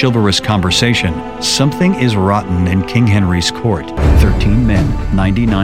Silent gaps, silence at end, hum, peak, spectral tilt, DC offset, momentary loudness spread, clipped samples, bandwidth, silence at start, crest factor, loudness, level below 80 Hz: none; 0 s; none; 0 dBFS; -5.5 dB/octave; 1%; 4 LU; under 0.1%; 15.5 kHz; 0 s; 12 dB; -13 LUFS; -20 dBFS